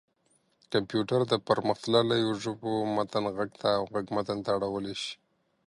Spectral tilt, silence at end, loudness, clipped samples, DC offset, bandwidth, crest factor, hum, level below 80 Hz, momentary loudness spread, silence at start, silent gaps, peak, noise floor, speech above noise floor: -5.5 dB/octave; 0.55 s; -29 LUFS; under 0.1%; under 0.1%; 11.5 kHz; 20 dB; none; -66 dBFS; 7 LU; 0.7 s; none; -10 dBFS; -70 dBFS; 42 dB